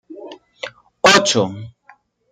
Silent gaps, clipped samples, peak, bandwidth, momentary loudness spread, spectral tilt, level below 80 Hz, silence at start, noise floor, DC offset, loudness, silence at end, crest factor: none; under 0.1%; 0 dBFS; 16 kHz; 24 LU; -2.5 dB/octave; -60 dBFS; 0.1 s; -52 dBFS; under 0.1%; -14 LUFS; 0.6 s; 18 dB